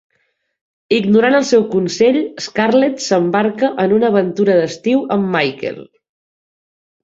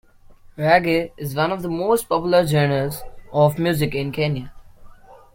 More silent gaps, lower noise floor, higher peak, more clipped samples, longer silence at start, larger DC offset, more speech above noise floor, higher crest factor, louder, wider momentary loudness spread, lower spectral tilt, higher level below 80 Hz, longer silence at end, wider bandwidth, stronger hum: neither; first, -66 dBFS vs -46 dBFS; about the same, -2 dBFS vs -2 dBFS; neither; first, 0.9 s vs 0.3 s; neither; first, 51 dB vs 27 dB; about the same, 14 dB vs 18 dB; first, -15 LUFS vs -20 LUFS; second, 7 LU vs 10 LU; about the same, -5.5 dB/octave vs -6 dB/octave; second, -60 dBFS vs -46 dBFS; first, 1.2 s vs 0.2 s; second, 8 kHz vs 16.5 kHz; neither